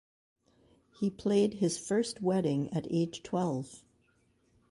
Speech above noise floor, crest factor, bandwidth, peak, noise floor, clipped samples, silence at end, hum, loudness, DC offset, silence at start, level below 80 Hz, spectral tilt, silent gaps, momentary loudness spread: 40 dB; 16 dB; 11.5 kHz; -16 dBFS; -71 dBFS; under 0.1%; 0.9 s; none; -32 LUFS; under 0.1%; 1 s; -68 dBFS; -6 dB/octave; none; 7 LU